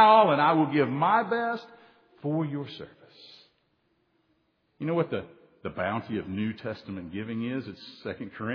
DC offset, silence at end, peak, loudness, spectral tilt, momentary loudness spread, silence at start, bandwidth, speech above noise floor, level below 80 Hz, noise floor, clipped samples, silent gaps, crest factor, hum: under 0.1%; 0 s; -6 dBFS; -28 LUFS; -8.5 dB/octave; 17 LU; 0 s; 5.4 kHz; 45 dB; -68 dBFS; -72 dBFS; under 0.1%; none; 22 dB; none